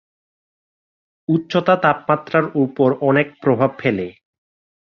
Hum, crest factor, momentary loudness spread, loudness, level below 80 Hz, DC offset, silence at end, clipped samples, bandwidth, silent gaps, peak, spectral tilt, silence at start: none; 18 dB; 6 LU; -18 LUFS; -58 dBFS; under 0.1%; 0.75 s; under 0.1%; 6.8 kHz; none; -2 dBFS; -8.5 dB/octave; 1.3 s